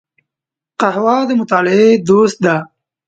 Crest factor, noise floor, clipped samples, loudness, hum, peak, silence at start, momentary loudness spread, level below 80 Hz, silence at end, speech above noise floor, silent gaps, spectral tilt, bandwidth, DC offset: 14 dB; -85 dBFS; under 0.1%; -13 LUFS; none; 0 dBFS; 0.8 s; 7 LU; -58 dBFS; 0.45 s; 74 dB; none; -6 dB/octave; 9 kHz; under 0.1%